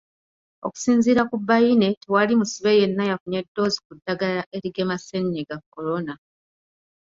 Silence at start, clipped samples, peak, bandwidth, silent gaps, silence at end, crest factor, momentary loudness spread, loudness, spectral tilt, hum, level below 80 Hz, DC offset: 0.65 s; under 0.1%; -4 dBFS; 7.8 kHz; 1.97-2.01 s, 3.20-3.26 s, 3.48-3.55 s, 3.85-3.90 s, 4.46-4.51 s, 5.66-5.72 s; 0.95 s; 18 dB; 13 LU; -22 LUFS; -5.5 dB/octave; none; -62 dBFS; under 0.1%